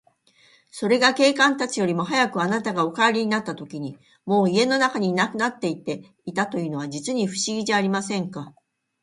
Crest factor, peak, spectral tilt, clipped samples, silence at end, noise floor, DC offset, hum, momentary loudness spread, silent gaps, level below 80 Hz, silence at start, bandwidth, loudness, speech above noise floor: 20 dB; -4 dBFS; -4 dB/octave; under 0.1%; 0.5 s; -58 dBFS; under 0.1%; none; 14 LU; none; -68 dBFS; 0.75 s; 11.5 kHz; -22 LUFS; 36 dB